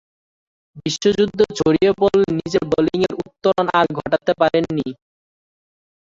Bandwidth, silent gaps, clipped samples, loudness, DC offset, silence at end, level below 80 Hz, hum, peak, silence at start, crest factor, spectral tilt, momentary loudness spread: 7.8 kHz; none; under 0.1%; -18 LUFS; under 0.1%; 1.2 s; -50 dBFS; none; -2 dBFS; 0.75 s; 18 dB; -5.5 dB/octave; 7 LU